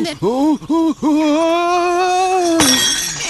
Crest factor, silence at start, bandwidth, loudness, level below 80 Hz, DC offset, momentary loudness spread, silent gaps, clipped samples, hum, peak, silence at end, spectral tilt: 14 dB; 0 s; 13 kHz; -14 LUFS; -46 dBFS; under 0.1%; 5 LU; none; under 0.1%; none; 0 dBFS; 0 s; -2.5 dB/octave